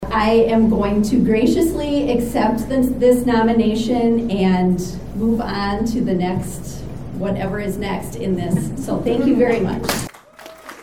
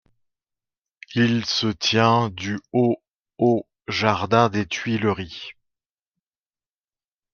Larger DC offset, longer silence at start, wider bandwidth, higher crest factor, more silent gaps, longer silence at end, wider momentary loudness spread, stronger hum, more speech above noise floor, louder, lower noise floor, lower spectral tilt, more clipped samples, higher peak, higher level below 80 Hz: first, 1% vs under 0.1%; second, 0 s vs 1.1 s; first, 17.5 kHz vs 7.2 kHz; second, 14 dB vs 22 dB; second, none vs 3.19-3.23 s; second, 0 s vs 1.8 s; about the same, 10 LU vs 11 LU; neither; second, 23 dB vs over 69 dB; first, -18 LUFS vs -22 LUFS; second, -40 dBFS vs under -90 dBFS; about the same, -6.5 dB/octave vs -5.5 dB/octave; neither; about the same, -4 dBFS vs -2 dBFS; first, -36 dBFS vs -62 dBFS